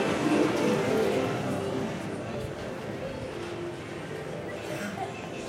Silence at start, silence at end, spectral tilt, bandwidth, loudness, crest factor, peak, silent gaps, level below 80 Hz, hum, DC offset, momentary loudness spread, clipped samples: 0 s; 0 s; -5.5 dB/octave; 16 kHz; -31 LUFS; 18 dB; -12 dBFS; none; -56 dBFS; none; under 0.1%; 11 LU; under 0.1%